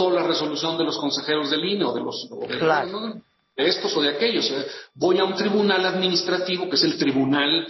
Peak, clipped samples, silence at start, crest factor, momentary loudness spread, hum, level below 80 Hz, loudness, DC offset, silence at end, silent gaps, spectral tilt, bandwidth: -6 dBFS; under 0.1%; 0 s; 16 dB; 10 LU; none; -68 dBFS; -22 LUFS; under 0.1%; 0 s; none; -4.5 dB/octave; 6.2 kHz